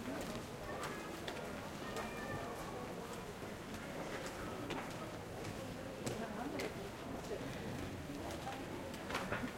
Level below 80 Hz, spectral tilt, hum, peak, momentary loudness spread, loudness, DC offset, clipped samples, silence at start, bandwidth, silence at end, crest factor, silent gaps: -60 dBFS; -4.5 dB/octave; none; -24 dBFS; 4 LU; -45 LUFS; under 0.1%; under 0.1%; 0 s; 16.5 kHz; 0 s; 20 dB; none